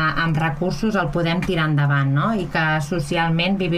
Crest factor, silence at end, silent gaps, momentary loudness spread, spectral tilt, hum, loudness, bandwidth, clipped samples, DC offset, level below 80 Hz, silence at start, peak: 12 dB; 0 s; none; 4 LU; -6.5 dB/octave; none; -20 LUFS; 13 kHz; under 0.1%; under 0.1%; -38 dBFS; 0 s; -6 dBFS